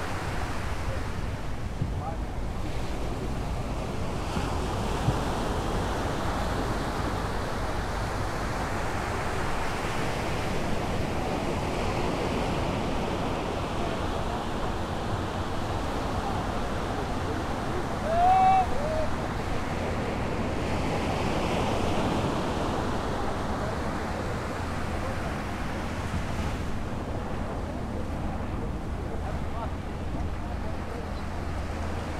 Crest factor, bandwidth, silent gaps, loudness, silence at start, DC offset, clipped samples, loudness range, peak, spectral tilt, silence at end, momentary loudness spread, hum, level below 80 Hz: 16 dB; 15 kHz; none; -30 LUFS; 0 s; under 0.1%; under 0.1%; 7 LU; -12 dBFS; -6 dB/octave; 0 s; 6 LU; none; -36 dBFS